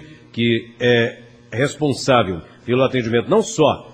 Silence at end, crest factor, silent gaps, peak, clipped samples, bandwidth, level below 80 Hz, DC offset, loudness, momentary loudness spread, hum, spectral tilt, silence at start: 0 s; 18 dB; none; 0 dBFS; under 0.1%; 10 kHz; -52 dBFS; under 0.1%; -18 LUFS; 8 LU; none; -5 dB/octave; 0 s